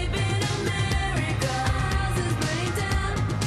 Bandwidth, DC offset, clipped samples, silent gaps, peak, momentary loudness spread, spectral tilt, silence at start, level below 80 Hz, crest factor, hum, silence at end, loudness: 13.5 kHz; under 0.1%; under 0.1%; none; -14 dBFS; 1 LU; -5 dB/octave; 0 s; -32 dBFS; 12 dB; none; 0 s; -26 LUFS